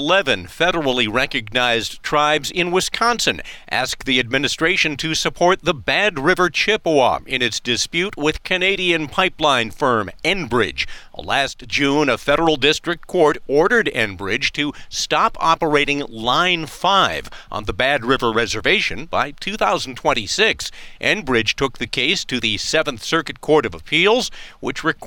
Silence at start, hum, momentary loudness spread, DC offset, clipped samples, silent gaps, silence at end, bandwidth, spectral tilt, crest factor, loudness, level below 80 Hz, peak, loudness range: 0 s; none; 6 LU; under 0.1%; under 0.1%; none; 0 s; 17.5 kHz; -3 dB/octave; 16 dB; -18 LUFS; -40 dBFS; -4 dBFS; 2 LU